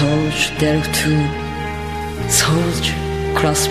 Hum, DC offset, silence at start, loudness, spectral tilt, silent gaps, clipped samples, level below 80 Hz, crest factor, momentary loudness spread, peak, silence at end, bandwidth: none; 0.9%; 0 s; -18 LUFS; -4 dB/octave; none; under 0.1%; -32 dBFS; 16 dB; 10 LU; 0 dBFS; 0 s; 15 kHz